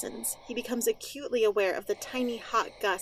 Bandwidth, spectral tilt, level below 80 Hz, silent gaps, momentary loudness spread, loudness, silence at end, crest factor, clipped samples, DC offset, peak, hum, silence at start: 16 kHz; -2 dB/octave; -64 dBFS; none; 7 LU; -30 LUFS; 0 s; 16 dB; under 0.1%; under 0.1%; -14 dBFS; none; 0 s